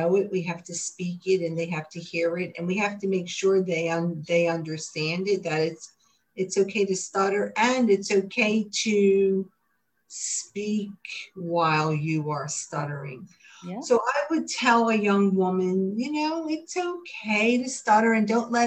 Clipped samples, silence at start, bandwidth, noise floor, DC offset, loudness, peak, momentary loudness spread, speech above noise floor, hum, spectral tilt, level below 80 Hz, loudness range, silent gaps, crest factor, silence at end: under 0.1%; 0 s; 9.4 kHz; -74 dBFS; under 0.1%; -25 LUFS; -8 dBFS; 12 LU; 49 dB; none; -4.5 dB/octave; -72 dBFS; 4 LU; none; 18 dB; 0 s